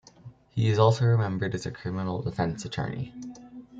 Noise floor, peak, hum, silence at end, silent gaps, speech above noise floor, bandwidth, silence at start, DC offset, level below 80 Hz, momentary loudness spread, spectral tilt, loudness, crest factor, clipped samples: -50 dBFS; -6 dBFS; none; 0 s; none; 24 dB; 7.8 kHz; 0.25 s; under 0.1%; -56 dBFS; 16 LU; -7 dB/octave; -27 LUFS; 22 dB; under 0.1%